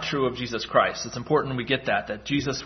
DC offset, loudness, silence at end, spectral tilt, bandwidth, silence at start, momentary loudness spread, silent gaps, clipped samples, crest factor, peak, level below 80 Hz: under 0.1%; -25 LUFS; 0 s; -4.5 dB/octave; 6.4 kHz; 0 s; 5 LU; none; under 0.1%; 20 dB; -4 dBFS; -52 dBFS